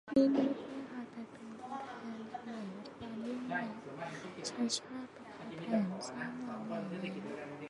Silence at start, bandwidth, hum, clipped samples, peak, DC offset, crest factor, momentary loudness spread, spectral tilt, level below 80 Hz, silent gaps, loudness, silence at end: 0.05 s; 11 kHz; none; under 0.1%; -18 dBFS; under 0.1%; 22 dB; 12 LU; -5 dB/octave; -76 dBFS; none; -39 LUFS; 0 s